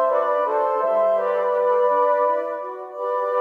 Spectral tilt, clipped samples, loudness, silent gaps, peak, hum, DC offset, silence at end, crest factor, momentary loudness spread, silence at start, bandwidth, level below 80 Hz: -5 dB/octave; under 0.1%; -21 LUFS; none; -8 dBFS; none; under 0.1%; 0 s; 14 dB; 10 LU; 0 s; 5 kHz; -80 dBFS